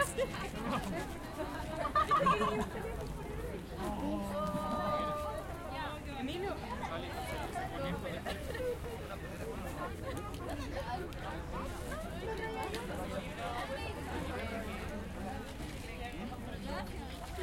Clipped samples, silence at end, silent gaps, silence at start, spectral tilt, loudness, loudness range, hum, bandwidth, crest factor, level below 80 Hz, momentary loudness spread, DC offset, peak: under 0.1%; 0 s; none; 0 s; -5.5 dB/octave; -39 LUFS; 6 LU; none; 16.5 kHz; 20 dB; -48 dBFS; 8 LU; under 0.1%; -18 dBFS